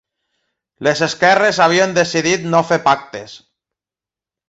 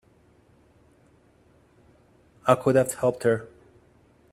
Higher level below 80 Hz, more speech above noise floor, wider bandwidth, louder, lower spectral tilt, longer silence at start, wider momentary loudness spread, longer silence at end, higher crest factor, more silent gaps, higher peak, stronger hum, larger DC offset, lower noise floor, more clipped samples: first, -58 dBFS vs -64 dBFS; first, 74 dB vs 37 dB; second, 8.2 kHz vs 16 kHz; first, -14 LUFS vs -24 LUFS; second, -4 dB/octave vs -6 dB/octave; second, 0.8 s vs 2.45 s; about the same, 8 LU vs 8 LU; first, 1.1 s vs 0.85 s; second, 16 dB vs 26 dB; neither; about the same, -2 dBFS vs -2 dBFS; neither; neither; first, -89 dBFS vs -59 dBFS; neither